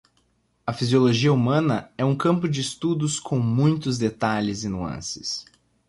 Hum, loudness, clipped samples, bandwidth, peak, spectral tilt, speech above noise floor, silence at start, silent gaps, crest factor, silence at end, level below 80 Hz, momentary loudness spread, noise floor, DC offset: none; -23 LUFS; under 0.1%; 11.5 kHz; -8 dBFS; -6 dB/octave; 44 dB; 0.65 s; none; 16 dB; 0.45 s; -54 dBFS; 11 LU; -66 dBFS; under 0.1%